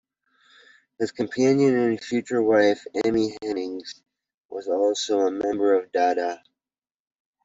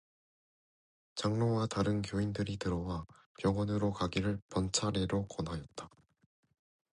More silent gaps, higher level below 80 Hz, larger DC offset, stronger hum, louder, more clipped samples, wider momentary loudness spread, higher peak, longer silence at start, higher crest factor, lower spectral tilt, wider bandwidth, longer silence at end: about the same, 4.34-4.49 s vs 3.26-3.35 s, 4.42-4.49 s; second, -66 dBFS vs -54 dBFS; neither; neither; first, -23 LUFS vs -35 LUFS; neither; about the same, 13 LU vs 11 LU; first, -6 dBFS vs -18 dBFS; second, 1 s vs 1.15 s; about the same, 18 dB vs 18 dB; about the same, -5 dB/octave vs -5.5 dB/octave; second, 8 kHz vs 11 kHz; about the same, 1.1 s vs 1.1 s